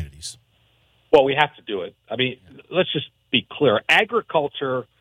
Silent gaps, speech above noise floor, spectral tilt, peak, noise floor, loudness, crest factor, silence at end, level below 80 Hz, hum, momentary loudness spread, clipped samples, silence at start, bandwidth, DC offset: none; 40 dB; -4.5 dB/octave; -2 dBFS; -61 dBFS; -21 LUFS; 20 dB; 0.2 s; -54 dBFS; none; 15 LU; under 0.1%; 0 s; 13.5 kHz; under 0.1%